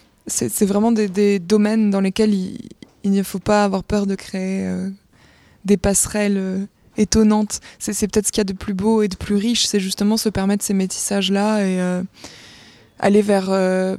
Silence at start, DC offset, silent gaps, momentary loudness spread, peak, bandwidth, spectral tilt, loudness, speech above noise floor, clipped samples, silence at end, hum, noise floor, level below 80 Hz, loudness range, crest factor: 0.25 s; under 0.1%; none; 9 LU; -2 dBFS; 15 kHz; -4.5 dB/octave; -19 LUFS; 33 dB; under 0.1%; 0 s; none; -51 dBFS; -42 dBFS; 3 LU; 16 dB